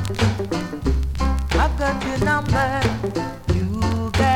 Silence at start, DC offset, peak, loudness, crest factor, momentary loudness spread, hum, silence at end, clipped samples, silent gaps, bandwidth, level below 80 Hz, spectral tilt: 0 s; under 0.1%; -6 dBFS; -22 LUFS; 16 dB; 6 LU; none; 0 s; under 0.1%; none; 15.5 kHz; -26 dBFS; -6 dB/octave